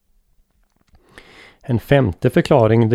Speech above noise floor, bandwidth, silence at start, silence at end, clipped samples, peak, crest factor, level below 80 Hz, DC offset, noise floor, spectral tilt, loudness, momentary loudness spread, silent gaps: 47 dB; 14.5 kHz; 1.7 s; 0 s; under 0.1%; -2 dBFS; 18 dB; -44 dBFS; under 0.1%; -61 dBFS; -8 dB/octave; -16 LUFS; 10 LU; none